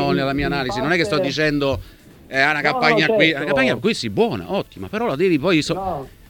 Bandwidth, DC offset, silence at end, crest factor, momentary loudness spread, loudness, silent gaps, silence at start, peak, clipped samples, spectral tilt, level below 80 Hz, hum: 18.5 kHz; under 0.1%; 0.2 s; 18 dB; 9 LU; -19 LUFS; none; 0 s; 0 dBFS; under 0.1%; -5 dB/octave; -44 dBFS; none